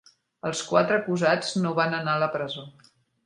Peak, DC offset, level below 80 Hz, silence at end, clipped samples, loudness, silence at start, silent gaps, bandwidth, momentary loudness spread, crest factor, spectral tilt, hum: -4 dBFS; under 0.1%; -70 dBFS; 0.55 s; under 0.1%; -25 LUFS; 0.45 s; none; 11 kHz; 10 LU; 22 dB; -5 dB/octave; none